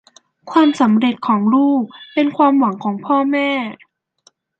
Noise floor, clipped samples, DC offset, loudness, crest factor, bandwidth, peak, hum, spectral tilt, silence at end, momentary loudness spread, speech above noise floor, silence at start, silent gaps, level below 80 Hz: -56 dBFS; under 0.1%; under 0.1%; -16 LUFS; 14 dB; 8.2 kHz; -2 dBFS; none; -6.5 dB/octave; 0.85 s; 8 LU; 41 dB; 0.45 s; none; -68 dBFS